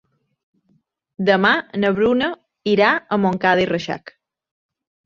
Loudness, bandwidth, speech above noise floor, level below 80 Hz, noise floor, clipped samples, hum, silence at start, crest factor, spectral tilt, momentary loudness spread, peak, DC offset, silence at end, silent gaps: -18 LUFS; 7.2 kHz; 46 dB; -56 dBFS; -64 dBFS; under 0.1%; none; 1.2 s; 20 dB; -6.5 dB/octave; 9 LU; -2 dBFS; under 0.1%; 0.95 s; none